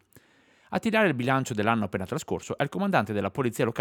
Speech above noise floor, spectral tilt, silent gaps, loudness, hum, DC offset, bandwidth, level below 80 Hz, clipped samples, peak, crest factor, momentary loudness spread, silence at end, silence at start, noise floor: 34 dB; -6 dB/octave; none; -27 LUFS; none; under 0.1%; 18 kHz; -64 dBFS; under 0.1%; -6 dBFS; 20 dB; 9 LU; 0 s; 0.7 s; -61 dBFS